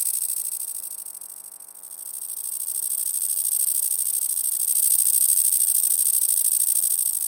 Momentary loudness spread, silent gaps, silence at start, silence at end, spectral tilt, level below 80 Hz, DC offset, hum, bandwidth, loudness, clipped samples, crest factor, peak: 18 LU; none; 0 s; 0 s; 5 dB/octave; -84 dBFS; under 0.1%; none; 17 kHz; -19 LUFS; under 0.1%; 20 dB; -4 dBFS